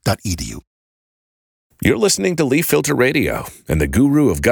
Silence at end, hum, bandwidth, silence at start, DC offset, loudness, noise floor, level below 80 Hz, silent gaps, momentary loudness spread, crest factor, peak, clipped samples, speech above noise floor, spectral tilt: 0 s; none; over 20 kHz; 0.05 s; under 0.1%; -17 LUFS; under -90 dBFS; -34 dBFS; 0.67-1.70 s; 11 LU; 16 dB; 0 dBFS; under 0.1%; over 74 dB; -5 dB/octave